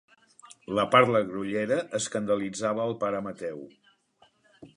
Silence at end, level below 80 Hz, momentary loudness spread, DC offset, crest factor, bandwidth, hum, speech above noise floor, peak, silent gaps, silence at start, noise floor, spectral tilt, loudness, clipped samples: 0.1 s; -68 dBFS; 16 LU; under 0.1%; 24 dB; 11 kHz; none; 38 dB; -4 dBFS; none; 0.7 s; -64 dBFS; -4.5 dB/octave; -27 LUFS; under 0.1%